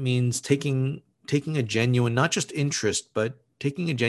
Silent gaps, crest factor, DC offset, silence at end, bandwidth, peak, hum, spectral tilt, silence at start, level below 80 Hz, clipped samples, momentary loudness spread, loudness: none; 18 dB; under 0.1%; 0 s; 12.5 kHz; -6 dBFS; none; -5 dB/octave; 0 s; -60 dBFS; under 0.1%; 8 LU; -26 LUFS